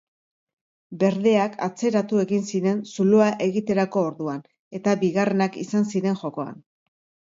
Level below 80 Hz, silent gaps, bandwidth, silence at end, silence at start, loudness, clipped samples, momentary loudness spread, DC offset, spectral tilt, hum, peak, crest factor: -68 dBFS; 4.59-4.71 s; 7.8 kHz; 0.7 s; 0.9 s; -23 LUFS; under 0.1%; 12 LU; under 0.1%; -6.5 dB/octave; none; -6 dBFS; 18 dB